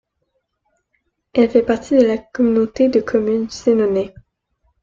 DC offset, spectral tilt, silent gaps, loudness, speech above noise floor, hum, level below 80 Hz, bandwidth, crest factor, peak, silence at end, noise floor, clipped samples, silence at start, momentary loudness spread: under 0.1%; -6.5 dB/octave; none; -17 LUFS; 55 dB; none; -52 dBFS; 7.6 kHz; 16 dB; -2 dBFS; 0.75 s; -71 dBFS; under 0.1%; 1.35 s; 5 LU